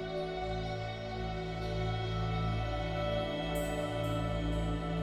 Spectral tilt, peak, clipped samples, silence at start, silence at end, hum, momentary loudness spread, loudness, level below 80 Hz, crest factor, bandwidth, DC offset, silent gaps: -6.5 dB/octave; -22 dBFS; under 0.1%; 0 s; 0 s; none; 4 LU; -36 LUFS; -42 dBFS; 12 dB; 15 kHz; under 0.1%; none